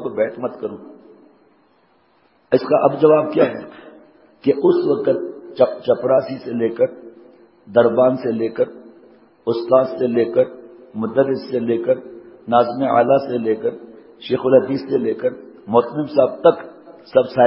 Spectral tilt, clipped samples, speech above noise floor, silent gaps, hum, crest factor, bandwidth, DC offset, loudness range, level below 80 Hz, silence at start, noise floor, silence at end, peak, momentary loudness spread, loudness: -11.5 dB/octave; under 0.1%; 41 dB; none; none; 18 dB; 5.8 kHz; under 0.1%; 2 LU; -64 dBFS; 0 s; -58 dBFS; 0 s; 0 dBFS; 13 LU; -18 LUFS